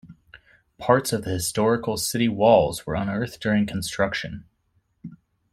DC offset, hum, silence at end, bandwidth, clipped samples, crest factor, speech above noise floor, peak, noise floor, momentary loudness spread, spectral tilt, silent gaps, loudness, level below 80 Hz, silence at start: under 0.1%; none; 0.35 s; 16 kHz; under 0.1%; 22 dB; 46 dB; -2 dBFS; -68 dBFS; 18 LU; -5 dB/octave; none; -23 LUFS; -52 dBFS; 0.05 s